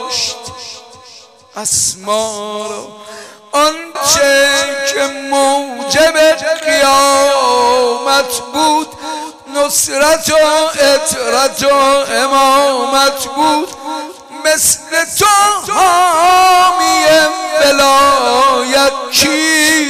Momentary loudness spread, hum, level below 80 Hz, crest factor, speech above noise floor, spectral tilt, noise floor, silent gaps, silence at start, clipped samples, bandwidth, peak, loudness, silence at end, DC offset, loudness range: 13 LU; none; -46 dBFS; 10 dB; 28 dB; -1 dB/octave; -39 dBFS; none; 0 s; under 0.1%; 15.5 kHz; -2 dBFS; -11 LUFS; 0 s; under 0.1%; 4 LU